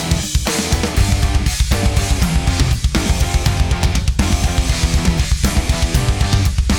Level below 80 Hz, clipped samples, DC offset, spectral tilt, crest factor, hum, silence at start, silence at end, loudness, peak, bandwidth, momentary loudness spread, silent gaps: -18 dBFS; under 0.1%; under 0.1%; -4.5 dB/octave; 14 dB; none; 0 s; 0 s; -17 LUFS; 0 dBFS; 18.5 kHz; 1 LU; none